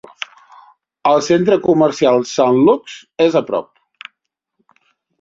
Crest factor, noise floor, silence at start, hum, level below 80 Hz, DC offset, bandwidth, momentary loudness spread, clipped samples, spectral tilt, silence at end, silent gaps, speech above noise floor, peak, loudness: 16 dB; -73 dBFS; 1.05 s; none; -58 dBFS; under 0.1%; 7.8 kHz; 17 LU; under 0.1%; -5.5 dB/octave; 1.6 s; none; 59 dB; -2 dBFS; -14 LUFS